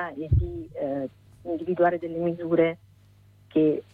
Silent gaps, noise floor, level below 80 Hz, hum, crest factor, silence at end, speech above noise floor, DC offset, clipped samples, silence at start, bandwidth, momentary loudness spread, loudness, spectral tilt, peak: none; -55 dBFS; -40 dBFS; 50 Hz at -55 dBFS; 16 dB; 0.1 s; 30 dB; under 0.1%; under 0.1%; 0 s; 4.5 kHz; 11 LU; -26 LUFS; -10 dB/octave; -10 dBFS